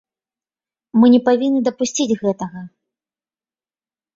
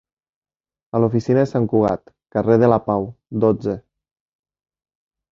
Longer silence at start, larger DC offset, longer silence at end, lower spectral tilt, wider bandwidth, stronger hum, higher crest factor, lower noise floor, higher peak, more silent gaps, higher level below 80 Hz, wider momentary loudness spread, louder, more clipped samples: about the same, 0.95 s vs 0.95 s; neither; about the same, 1.5 s vs 1.55 s; second, -5 dB/octave vs -9.5 dB/octave; about the same, 7.6 kHz vs 7.4 kHz; neither; about the same, 18 dB vs 20 dB; about the same, under -90 dBFS vs under -90 dBFS; about the same, -2 dBFS vs -2 dBFS; neither; second, -62 dBFS vs -52 dBFS; first, 15 LU vs 12 LU; first, -16 LUFS vs -19 LUFS; neither